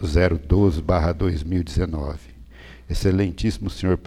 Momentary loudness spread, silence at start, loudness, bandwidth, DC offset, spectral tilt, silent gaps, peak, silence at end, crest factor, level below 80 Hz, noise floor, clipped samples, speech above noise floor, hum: 10 LU; 0 s; -22 LUFS; 13 kHz; under 0.1%; -7.5 dB/octave; none; -6 dBFS; 0 s; 16 dB; -30 dBFS; -43 dBFS; under 0.1%; 22 dB; none